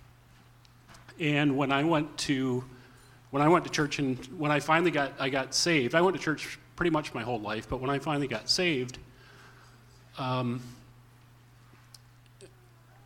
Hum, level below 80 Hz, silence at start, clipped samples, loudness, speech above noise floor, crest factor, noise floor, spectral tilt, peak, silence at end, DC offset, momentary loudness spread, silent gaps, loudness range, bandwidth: none; -58 dBFS; 0.9 s; under 0.1%; -29 LUFS; 29 dB; 22 dB; -57 dBFS; -4.5 dB/octave; -8 dBFS; 0.6 s; under 0.1%; 11 LU; none; 12 LU; 16.5 kHz